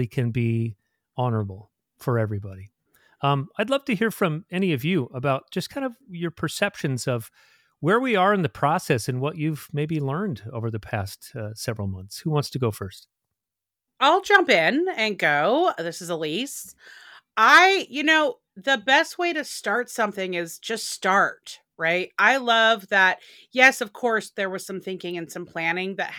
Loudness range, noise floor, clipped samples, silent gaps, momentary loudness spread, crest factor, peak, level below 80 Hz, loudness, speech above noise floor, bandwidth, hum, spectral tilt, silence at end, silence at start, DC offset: 8 LU; -87 dBFS; under 0.1%; none; 14 LU; 22 dB; -2 dBFS; -64 dBFS; -23 LUFS; 64 dB; 18.5 kHz; none; -4.5 dB/octave; 0 s; 0 s; under 0.1%